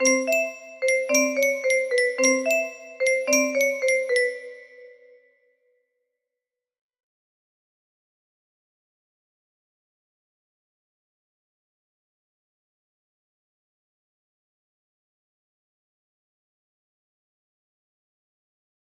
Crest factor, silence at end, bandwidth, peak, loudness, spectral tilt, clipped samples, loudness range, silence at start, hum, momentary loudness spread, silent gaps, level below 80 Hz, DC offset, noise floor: 22 dB; 14.1 s; 15 kHz; -8 dBFS; -22 LUFS; 0 dB/octave; under 0.1%; 8 LU; 0 s; none; 8 LU; none; -80 dBFS; under 0.1%; -88 dBFS